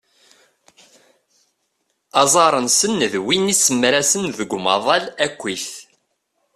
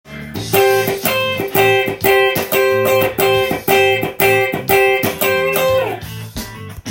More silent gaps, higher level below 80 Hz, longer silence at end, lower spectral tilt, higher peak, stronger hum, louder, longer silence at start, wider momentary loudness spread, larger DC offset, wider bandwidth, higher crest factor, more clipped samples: neither; second, -62 dBFS vs -44 dBFS; first, 0.75 s vs 0 s; second, -2 dB/octave vs -4 dB/octave; about the same, 0 dBFS vs 0 dBFS; neither; second, -17 LUFS vs -14 LUFS; first, 2.15 s vs 0.05 s; second, 11 LU vs 14 LU; neither; second, 15 kHz vs 17 kHz; about the same, 20 dB vs 16 dB; neither